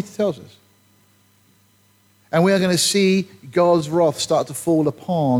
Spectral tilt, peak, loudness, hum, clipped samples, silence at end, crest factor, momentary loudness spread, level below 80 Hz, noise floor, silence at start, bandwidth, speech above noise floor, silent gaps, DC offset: -5 dB/octave; -6 dBFS; -19 LUFS; none; under 0.1%; 0 s; 14 dB; 7 LU; -62 dBFS; -58 dBFS; 0 s; 16.5 kHz; 39 dB; none; under 0.1%